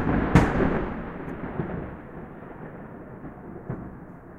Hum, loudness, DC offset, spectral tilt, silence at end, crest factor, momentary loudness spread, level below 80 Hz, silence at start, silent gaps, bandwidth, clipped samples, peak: none; -27 LUFS; under 0.1%; -8 dB/octave; 0 s; 26 dB; 20 LU; -38 dBFS; 0 s; none; 12 kHz; under 0.1%; -2 dBFS